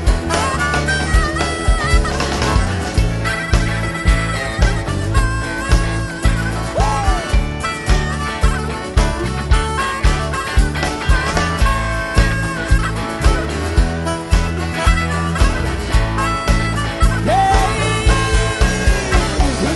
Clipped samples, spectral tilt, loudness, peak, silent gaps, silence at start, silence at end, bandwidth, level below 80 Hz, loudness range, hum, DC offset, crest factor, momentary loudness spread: under 0.1%; -5 dB/octave; -17 LUFS; 0 dBFS; none; 0 s; 0 s; 12 kHz; -18 dBFS; 2 LU; none; under 0.1%; 16 dB; 4 LU